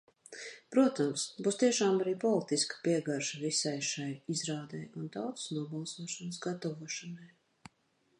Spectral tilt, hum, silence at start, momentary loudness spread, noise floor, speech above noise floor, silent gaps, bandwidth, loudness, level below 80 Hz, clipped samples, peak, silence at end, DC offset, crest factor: -4 dB/octave; none; 0.3 s; 13 LU; -74 dBFS; 40 dB; none; 11.5 kHz; -33 LUFS; -82 dBFS; under 0.1%; -16 dBFS; 0.9 s; under 0.1%; 20 dB